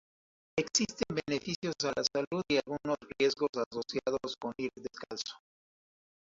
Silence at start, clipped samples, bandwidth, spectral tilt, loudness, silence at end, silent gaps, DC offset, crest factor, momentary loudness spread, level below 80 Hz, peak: 0.55 s; under 0.1%; 7.8 kHz; -3.5 dB/octave; -34 LUFS; 0.95 s; 1.56-1.62 s, 2.27-2.31 s, 3.49-3.53 s, 3.66-3.71 s; under 0.1%; 22 dB; 9 LU; -68 dBFS; -12 dBFS